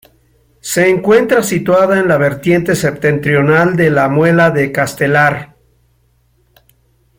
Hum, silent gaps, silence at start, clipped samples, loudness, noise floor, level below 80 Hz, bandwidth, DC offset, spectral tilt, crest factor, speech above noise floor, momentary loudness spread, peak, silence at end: none; none; 0.65 s; under 0.1%; -12 LUFS; -55 dBFS; -48 dBFS; 17 kHz; under 0.1%; -6 dB/octave; 12 dB; 44 dB; 5 LU; 0 dBFS; 1.75 s